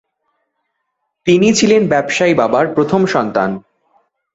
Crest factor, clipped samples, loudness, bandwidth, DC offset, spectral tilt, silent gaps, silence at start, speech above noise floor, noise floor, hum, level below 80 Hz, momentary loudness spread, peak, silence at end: 14 dB; under 0.1%; -13 LUFS; 8.2 kHz; under 0.1%; -5 dB/octave; none; 1.25 s; 59 dB; -72 dBFS; none; -52 dBFS; 8 LU; 0 dBFS; 0.75 s